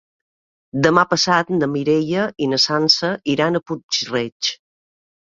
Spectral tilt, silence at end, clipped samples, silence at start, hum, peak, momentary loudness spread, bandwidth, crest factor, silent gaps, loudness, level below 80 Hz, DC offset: -4 dB/octave; 0.85 s; under 0.1%; 0.75 s; none; 0 dBFS; 8 LU; 7.8 kHz; 20 dB; 3.83-3.89 s, 4.32-4.40 s; -18 LUFS; -58 dBFS; under 0.1%